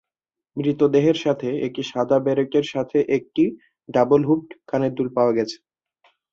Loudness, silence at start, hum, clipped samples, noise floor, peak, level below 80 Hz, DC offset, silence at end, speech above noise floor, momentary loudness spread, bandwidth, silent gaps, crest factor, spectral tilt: -21 LUFS; 0.55 s; none; under 0.1%; -87 dBFS; -6 dBFS; -62 dBFS; under 0.1%; 0.8 s; 67 dB; 8 LU; 7.4 kHz; none; 16 dB; -7 dB/octave